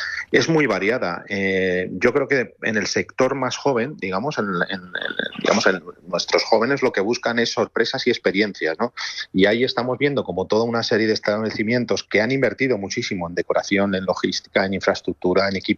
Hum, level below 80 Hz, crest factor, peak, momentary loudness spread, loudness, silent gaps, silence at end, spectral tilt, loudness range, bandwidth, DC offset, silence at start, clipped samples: none; -60 dBFS; 18 dB; -4 dBFS; 7 LU; -21 LUFS; none; 0 s; -4.5 dB/octave; 2 LU; 7.8 kHz; under 0.1%; 0 s; under 0.1%